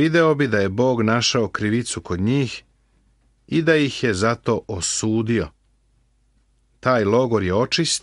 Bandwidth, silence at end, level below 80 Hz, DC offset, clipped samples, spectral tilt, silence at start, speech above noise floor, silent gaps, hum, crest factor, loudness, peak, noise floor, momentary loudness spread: 11.5 kHz; 0.05 s; -50 dBFS; under 0.1%; under 0.1%; -4.5 dB/octave; 0 s; 42 dB; none; none; 18 dB; -20 LUFS; -4 dBFS; -61 dBFS; 6 LU